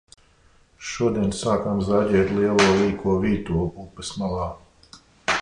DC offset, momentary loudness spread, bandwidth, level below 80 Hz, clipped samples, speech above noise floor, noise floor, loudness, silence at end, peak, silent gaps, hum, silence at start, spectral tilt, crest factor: under 0.1%; 14 LU; 11 kHz; -42 dBFS; under 0.1%; 35 dB; -57 dBFS; -22 LUFS; 0 s; -4 dBFS; none; none; 0.8 s; -5.5 dB/octave; 18 dB